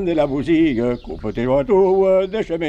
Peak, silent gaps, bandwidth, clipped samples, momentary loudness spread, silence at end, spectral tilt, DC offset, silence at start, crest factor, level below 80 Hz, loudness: -6 dBFS; none; 8 kHz; under 0.1%; 9 LU; 0 s; -8 dB/octave; under 0.1%; 0 s; 12 dB; -40 dBFS; -18 LUFS